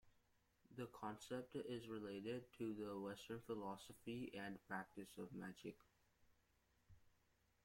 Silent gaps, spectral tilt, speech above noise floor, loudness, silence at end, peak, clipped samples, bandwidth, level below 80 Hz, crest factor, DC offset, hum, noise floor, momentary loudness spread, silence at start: none; -5.5 dB/octave; 30 dB; -52 LUFS; 0.55 s; -34 dBFS; under 0.1%; 16.5 kHz; -80 dBFS; 20 dB; under 0.1%; none; -81 dBFS; 6 LU; 0.05 s